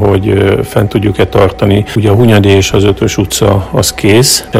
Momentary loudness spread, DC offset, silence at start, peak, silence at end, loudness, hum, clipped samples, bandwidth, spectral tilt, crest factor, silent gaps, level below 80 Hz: 5 LU; under 0.1%; 0 s; 0 dBFS; 0 s; -9 LUFS; none; 2%; 16 kHz; -5 dB/octave; 8 dB; none; -28 dBFS